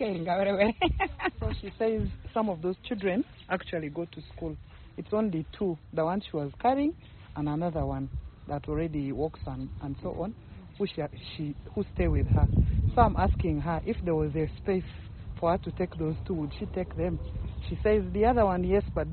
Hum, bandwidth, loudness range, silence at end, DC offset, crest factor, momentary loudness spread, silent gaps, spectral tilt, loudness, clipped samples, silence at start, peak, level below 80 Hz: none; 4.5 kHz; 6 LU; 0 s; under 0.1%; 20 dB; 13 LU; none; -6.5 dB/octave; -30 LUFS; under 0.1%; 0 s; -8 dBFS; -38 dBFS